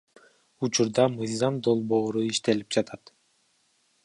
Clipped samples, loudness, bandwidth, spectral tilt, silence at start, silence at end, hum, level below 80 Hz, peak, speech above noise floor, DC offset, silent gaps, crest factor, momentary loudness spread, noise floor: under 0.1%; -26 LUFS; 11.5 kHz; -4.5 dB/octave; 0.6 s; 1.1 s; none; -68 dBFS; -8 dBFS; 43 dB; under 0.1%; none; 20 dB; 7 LU; -68 dBFS